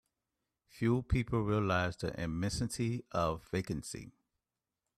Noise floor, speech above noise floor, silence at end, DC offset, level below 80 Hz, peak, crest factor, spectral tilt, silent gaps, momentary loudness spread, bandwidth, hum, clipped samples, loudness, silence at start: under -90 dBFS; over 56 dB; 0.9 s; under 0.1%; -52 dBFS; -18 dBFS; 18 dB; -6 dB/octave; none; 8 LU; 13.5 kHz; none; under 0.1%; -35 LUFS; 0.75 s